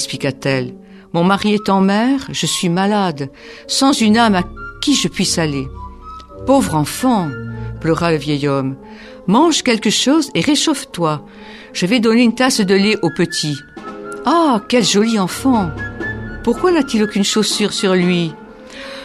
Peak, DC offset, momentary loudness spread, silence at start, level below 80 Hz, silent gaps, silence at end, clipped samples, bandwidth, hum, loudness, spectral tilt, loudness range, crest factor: 0 dBFS; under 0.1%; 15 LU; 0 s; -42 dBFS; none; 0 s; under 0.1%; 14.5 kHz; none; -15 LUFS; -4.5 dB/octave; 3 LU; 16 dB